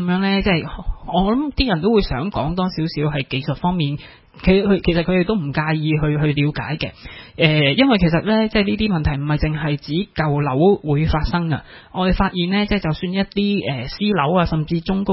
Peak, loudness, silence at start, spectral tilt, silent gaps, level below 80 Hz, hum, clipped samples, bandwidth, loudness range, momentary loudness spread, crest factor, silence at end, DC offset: 0 dBFS; -19 LUFS; 0 s; -11 dB/octave; none; -32 dBFS; none; under 0.1%; 5.8 kHz; 2 LU; 8 LU; 18 dB; 0 s; under 0.1%